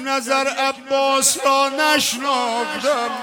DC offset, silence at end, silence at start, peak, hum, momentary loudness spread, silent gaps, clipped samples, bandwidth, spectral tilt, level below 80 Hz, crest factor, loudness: under 0.1%; 0 s; 0 s; -4 dBFS; none; 5 LU; none; under 0.1%; 17.5 kHz; -0.5 dB/octave; -66 dBFS; 16 dB; -18 LUFS